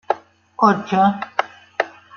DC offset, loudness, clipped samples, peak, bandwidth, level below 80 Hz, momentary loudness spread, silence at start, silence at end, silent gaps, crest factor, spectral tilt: under 0.1%; -20 LUFS; under 0.1%; -2 dBFS; 6.8 kHz; -64 dBFS; 11 LU; 0.1 s; 0.3 s; none; 20 dB; -6.5 dB/octave